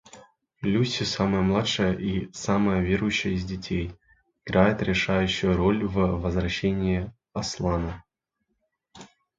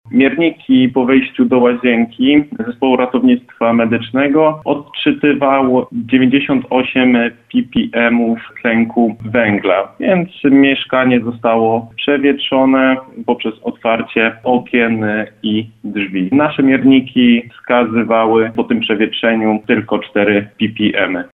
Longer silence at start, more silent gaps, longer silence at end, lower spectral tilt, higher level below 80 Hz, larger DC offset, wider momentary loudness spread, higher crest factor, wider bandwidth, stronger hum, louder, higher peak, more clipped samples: about the same, 0.15 s vs 0.05 s; neither; first, 0.3 s vs 0.05 s; second, -5.5 dB/octave vs -8.5 dB/octave; first, -42 dBFS vs -52 dBFS; neither; about the same, 9 LU vs 7 LU; first, 22 dB vs 14 dB; first, 7.8 kHz vs 4 kHz; neither; second, -25 LUFS vs -13 LUFS; second, -4 dBFS vs 0 dBFS; neither